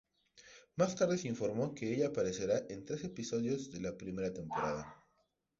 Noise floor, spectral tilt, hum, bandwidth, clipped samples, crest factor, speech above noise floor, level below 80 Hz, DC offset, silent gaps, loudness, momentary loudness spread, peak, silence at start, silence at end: -79 dBFS; -6 dB/octave; none; 7.6 kHz; under 0.1%; 20 dB; 42 dB; -66 dBFS; under 0.1%; none; -37 LUFS; 9 LU; -18 dBFS; 0.35 s; 0.65 s